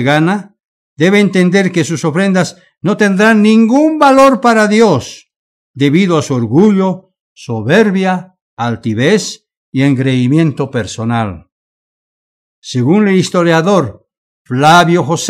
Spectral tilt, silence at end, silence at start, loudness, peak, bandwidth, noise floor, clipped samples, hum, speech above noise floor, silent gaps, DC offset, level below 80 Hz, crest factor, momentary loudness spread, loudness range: -6 dB/octave; 0 s; 0 s; -11 LUFS; 0 dBFS; 14 kHz; under -90 dBFS; 0.6%; none; over 80 dB; 0.65-0.96 s, 5.36-5.74 s, 7.21-7.36 s, 8.42-8.57 s, 9.57-9.72 s, 11.52-12.62 s, 14.18-14.45 s; under 0.1%; -52 dBFS; 12 dB; 13 LU; 6 LU